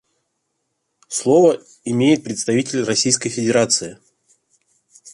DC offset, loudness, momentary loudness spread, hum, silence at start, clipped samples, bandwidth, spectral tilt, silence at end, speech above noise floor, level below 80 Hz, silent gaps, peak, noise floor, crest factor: under 0.1%; -17 LUFS; 10 LU; none; 1.1 s; under 0.1%; 11.5 kHz; -4 dB/octave; 0.05 s; 56 dB; -62 dBFS; none; -2 dBFS; -73 dBFS; 18 dB